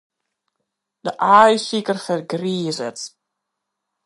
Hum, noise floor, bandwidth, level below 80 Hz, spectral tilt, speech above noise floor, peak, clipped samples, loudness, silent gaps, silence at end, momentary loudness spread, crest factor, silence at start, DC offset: none; -79 dBFS; 11.5 kHz; -70 dBFS; -4.5 dB/octave; 62 dB; 0 dBFS; under 0.1%; -18 LUFS; none; 0.95 s; 18 LU; 20 dB; 1.05 s; under 0.1%